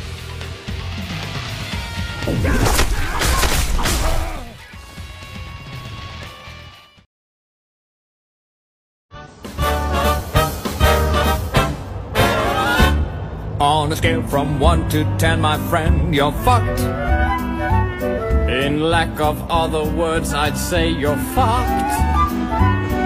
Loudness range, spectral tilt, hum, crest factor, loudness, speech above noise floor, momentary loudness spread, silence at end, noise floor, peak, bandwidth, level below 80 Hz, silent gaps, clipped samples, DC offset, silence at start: 14 LU; -5 dB/octave; none; 16 dB; -18 LUFS; 24 dB; 16 LU; 0 s; -41 dBFS; -2 dBFS; 16 kHz; -24 dBFS; 7.06-9.09 s; under 0.1%; under 0.1%; 0 s